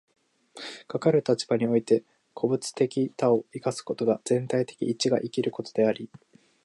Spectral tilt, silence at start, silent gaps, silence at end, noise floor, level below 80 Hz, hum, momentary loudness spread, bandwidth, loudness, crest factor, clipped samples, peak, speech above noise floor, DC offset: -5.5 dB/octave; 0.55 s; none; 0.6 s; -46 dBFS; -74 dBFS; none; 9 LU; 11.5 kHz; -27 LUFS; 18 dB; under 0.1%; -8 dBFS; 20 dB; under 0.1%